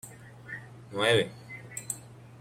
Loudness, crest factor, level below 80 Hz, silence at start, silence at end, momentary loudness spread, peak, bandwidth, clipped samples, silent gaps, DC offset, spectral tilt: -30 LUFS; 22 dB; -66 dBFS; 0.05 s; 0 s; 22 LU; -12 dBFS; 16 kHz; under 0.1%; none; under 0.1%; -3.5 dB/octave